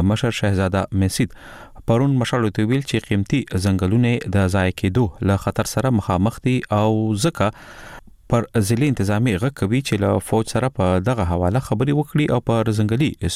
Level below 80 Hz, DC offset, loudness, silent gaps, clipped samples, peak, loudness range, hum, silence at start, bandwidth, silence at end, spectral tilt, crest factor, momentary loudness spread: -42 dBFS; under 0.1%; -20 LUFS; none; under 0.1%; -6 dBFS; 1 LU; none; 0 s; 15.5 kHz; 0 s; -6.5 dB/octave; 14 dB; 4 LU